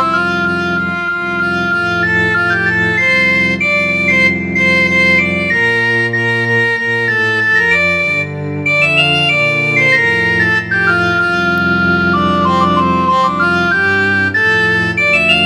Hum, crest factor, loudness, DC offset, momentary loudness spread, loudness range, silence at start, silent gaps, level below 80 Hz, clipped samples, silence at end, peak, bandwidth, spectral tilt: none; 12 dB; -11 LUFS; under 0.1%; 5 LU; 2 LU; 0 s; none; -42 dBFS; under 0.1%; 0 s; 0 dBFS; 13.5 kHz; -5 dB/octave